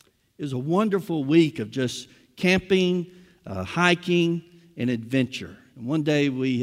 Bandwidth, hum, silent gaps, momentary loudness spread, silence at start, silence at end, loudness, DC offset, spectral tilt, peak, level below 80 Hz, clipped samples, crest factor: 15 kHz; none; none; 16 LU; 0.4 s; 0 s; -24 LUFS; under 0.1%; -6 dB/octave; -4 dBFS; -60 dBFS; under 0.1%; 20 dB